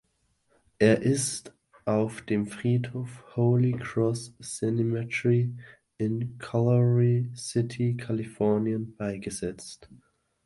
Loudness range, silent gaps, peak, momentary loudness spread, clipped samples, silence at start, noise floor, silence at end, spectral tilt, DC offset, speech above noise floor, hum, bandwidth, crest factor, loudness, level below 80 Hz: 2 LU; none; -6 dBFS; 13 LU; under 0.1%; 0.8 s; -72 dBFS; 0.5 s; -6.5 dB/octave; under 0.1%; 45 dB; none; 11.5 kHz; 22 dB; -27 LUFS; -60 dBFS